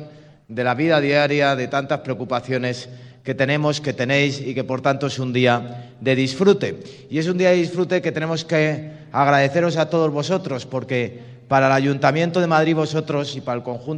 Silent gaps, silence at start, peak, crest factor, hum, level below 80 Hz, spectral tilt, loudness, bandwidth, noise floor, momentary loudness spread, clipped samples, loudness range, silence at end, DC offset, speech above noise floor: none; 0 s; 0 dBFS; 20 dB; none; -64 dBFS; -6 dB/octave; -20 LUFS; 10 kHz; -42 dBFS; 10 LU; under 0.1%; 2 LU; 0 s; under 0.1%; 22 dB